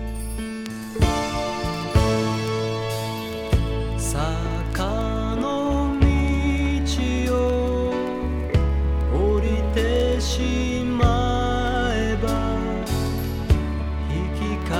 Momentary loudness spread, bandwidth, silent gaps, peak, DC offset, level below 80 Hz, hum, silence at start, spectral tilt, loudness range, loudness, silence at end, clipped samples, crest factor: 6 LU; 15.5 kHz; none; -4 dBFS; under 0.1%; -26 dBFS; none; 0 s; -6 dB/octave; 2 LU; -23 LUFS; 0 s; under 0.1%; 18 dB